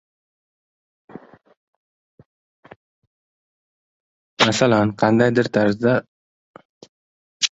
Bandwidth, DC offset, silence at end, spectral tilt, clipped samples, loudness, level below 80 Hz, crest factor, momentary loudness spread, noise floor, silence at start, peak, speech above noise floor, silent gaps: 8 kHz; under 0.1%; 0.1 s; -4.5 dB/octave; under 0.1%; -18 LUFS; -58 dBFS; 22 dB; 5 LU; under -90 dBFS; 4.4 s; 0 dBFS; over 73 dB; 6.08-6.54 s, 6.65-6.81 s, 6.89-7.40 s